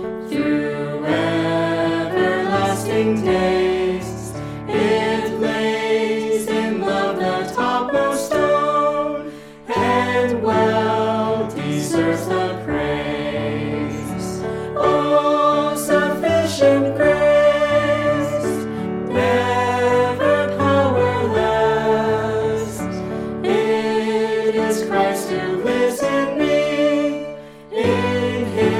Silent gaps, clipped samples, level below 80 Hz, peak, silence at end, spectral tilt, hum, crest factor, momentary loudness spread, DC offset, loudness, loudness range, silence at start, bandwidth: none; under 0.1%; -46 dBFS; -4 dBFS; 0 s; -5.5 dB/octave; none; 16 dB; 9 LU; under 0.1%; -19 LUFS; 3 LU; 0 s; 15.5 kHz